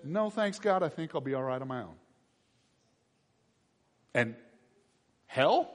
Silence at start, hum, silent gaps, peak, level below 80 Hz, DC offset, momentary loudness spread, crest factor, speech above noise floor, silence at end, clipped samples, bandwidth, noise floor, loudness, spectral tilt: 0 s; none; none; -12 dBFS; -76 dBFS; under 0.1%; 11 LU; 22 dB; 42 dB; 0 s; under 0.1%; 10.5 kHz; -73 dBFS; -32 LUFS; -6 dB/octave